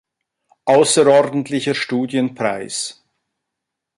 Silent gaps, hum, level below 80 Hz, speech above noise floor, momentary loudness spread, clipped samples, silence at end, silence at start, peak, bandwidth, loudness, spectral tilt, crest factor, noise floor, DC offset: none; none; -64 dBFS; 65 dB; 13 LU; under 0.1%; 1.05 s; 0.65 s; -2 dBFS; 11.5 kHz; -17 LUFS; -4 dB/octave; 18 dB; -81 dBFS; under 0.1%